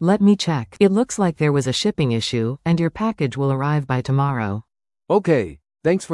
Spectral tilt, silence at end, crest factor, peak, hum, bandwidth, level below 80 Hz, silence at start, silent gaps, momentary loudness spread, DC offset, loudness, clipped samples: -6 dB/octave; 0 s; 16 dB; -4 dBFS; none; 12 kHz; -52 dBFS; 0 s; none; 6 LU; under 0.1%; -20 LUFS; under 0.1%